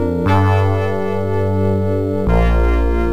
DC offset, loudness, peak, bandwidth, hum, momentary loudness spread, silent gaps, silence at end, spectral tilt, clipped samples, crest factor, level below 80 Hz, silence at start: 4%; -17 LUFS; -2 dBFS; 7.4 kHz; none; 4 LU; none; 0 s; -8.5 dB/octave; under 0.1%; 12 dB; -20 dBFS; 0 s